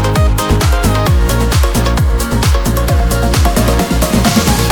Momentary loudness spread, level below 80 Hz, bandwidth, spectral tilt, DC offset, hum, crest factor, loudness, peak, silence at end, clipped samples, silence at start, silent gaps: 2 LU; -14 dBFS; 19 kHz; -5 dB/octave; under 0.1%; none; 10 dB; -12 LUFS; 0 dBFS; 0 s; under 0.1%; 0 s; none